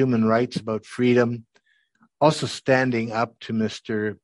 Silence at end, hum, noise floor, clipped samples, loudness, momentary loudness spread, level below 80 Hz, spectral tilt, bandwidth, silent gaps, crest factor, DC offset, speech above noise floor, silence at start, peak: 0.1 s; none; -64 dBFS; under 0.1%; -23 LUFS; 8 LU; -64 dBFS; -6 dB/octave; 11.5 kHz; none; 20 dB; under 0.1%; 42 dB; 0 s; -4 dBFS